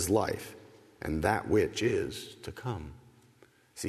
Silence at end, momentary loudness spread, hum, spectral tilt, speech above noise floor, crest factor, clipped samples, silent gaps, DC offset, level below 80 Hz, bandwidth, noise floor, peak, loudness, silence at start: 0 s; 20 LU; none; -5 dB/octave; 31 dB; 22 dB; under 0.1%; none; under 0.1%; -52 dBFS; 13.5 kHz; -62 dBFS; -12 dBFS; -32 LUFS; 0 s